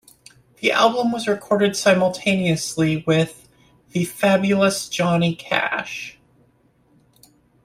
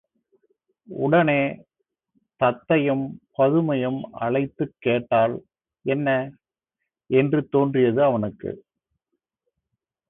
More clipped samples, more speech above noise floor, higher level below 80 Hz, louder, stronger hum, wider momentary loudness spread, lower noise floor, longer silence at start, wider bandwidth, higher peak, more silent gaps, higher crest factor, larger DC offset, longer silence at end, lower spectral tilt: neither; second, 40 dB vs 62 dB; about the same, -58 dBFS vs -62 dBFS; about the same, -20 LUFS vs -22 LUFS; neither; second, 9 LU vs 14 LU; second, -59 dBFS vs -83 dBFS; second, 0.6 s vs 0.9 s; first, 16 kHz vs 4 kHz; first, -2 dBFS vs -6 dBFS; neither; about the same, 18 dB vs 18 dB; neither; about the same, 1.55 s vs 1.5 s; second, -5 dB/octave vs -11.5 dB/octave